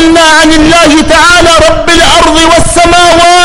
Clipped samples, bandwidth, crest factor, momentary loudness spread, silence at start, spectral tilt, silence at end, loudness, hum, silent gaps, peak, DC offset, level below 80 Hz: 5%; over 20 kHz; 4 dB; 2 LU; 0 s; -3 dB/octave; 0 s; -2 LUFS; none; none; 0 dBFS; under 0.1%; -18 dBFS